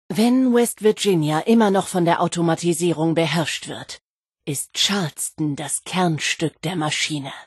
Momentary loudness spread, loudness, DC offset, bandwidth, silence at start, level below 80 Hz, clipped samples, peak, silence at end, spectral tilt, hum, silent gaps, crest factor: 10 LU; -20 LUFS; under 0.1%; 12.5 kHz; 0.1 s; -64 dBFS; under 0.1%; -4 dBFS; 0 s; -4.5 dB/octave; none; 4.01-4.23 s; 16 dB